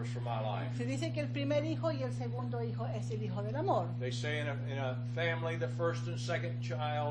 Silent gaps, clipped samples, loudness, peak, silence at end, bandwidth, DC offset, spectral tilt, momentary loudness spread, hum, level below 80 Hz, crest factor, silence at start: none; under 0.1%; -36 LUFS; -18 dBFS; 0 s; 9.4 kHz; under 0.1%; -6.5 dB/octave; 4 LU; 60 Hz at -40 dBFS; -64 dBFS; 16 dB; 0 s